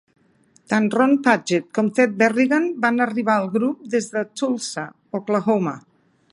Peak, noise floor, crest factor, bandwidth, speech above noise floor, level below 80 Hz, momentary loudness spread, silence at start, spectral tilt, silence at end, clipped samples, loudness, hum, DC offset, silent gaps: -2 dBFS; -58 dBFS; 18 dB; 11.5 kHz; 38 dB; -72 dBFS; 10 LU; 0.7 s; -5.5 dB/octave; 0.55 s; under 0.1%; -20 LUFS; none; under 0.1%; none